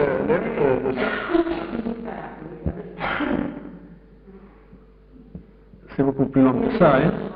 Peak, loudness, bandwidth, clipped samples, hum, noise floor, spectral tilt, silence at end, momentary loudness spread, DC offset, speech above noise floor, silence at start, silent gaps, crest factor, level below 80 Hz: -4 dBFS; -22 LUFS; 5 kHz; under 0.1%; none; -48 dBFS; -6 dB/octave; 0 s; 18 LU; under 0.1%; 28 dB; 0 s; none; 18 dB; -44 dBFS